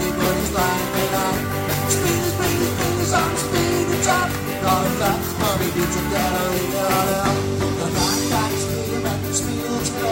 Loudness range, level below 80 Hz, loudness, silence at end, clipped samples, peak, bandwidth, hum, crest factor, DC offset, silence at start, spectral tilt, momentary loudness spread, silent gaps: 1 LU; -38 dBFS; -20 LUFS; 0 s; under 0.1%; -4 dBFS; 16.5 kHz; none; 16 dB; under 0.1%; 0 s; -4 dB/octave; 4 LU; none